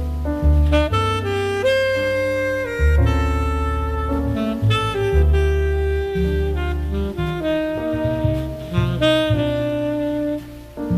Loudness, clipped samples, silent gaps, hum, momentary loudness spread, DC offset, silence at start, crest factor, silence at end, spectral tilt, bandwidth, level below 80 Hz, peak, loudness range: -20 LUFS; under 0.1%; none; none; 6 LU; under 0.1%; 0 s; 14 dB; 0 s; -7 dB/octave; 14 kHz; -24 dBFS; -6 dBFS; 2 LU